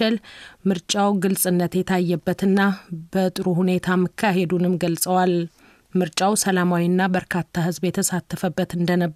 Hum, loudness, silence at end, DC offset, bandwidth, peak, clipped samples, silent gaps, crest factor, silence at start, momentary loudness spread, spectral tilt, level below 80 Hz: none; -21 LUFS; 0 s; under 0.1%; 15.5 kHz; -6 dBFS; under 0.1%; none; 14 dB; 0 s; 6 LU; -5 dB/octave; -56 dBFS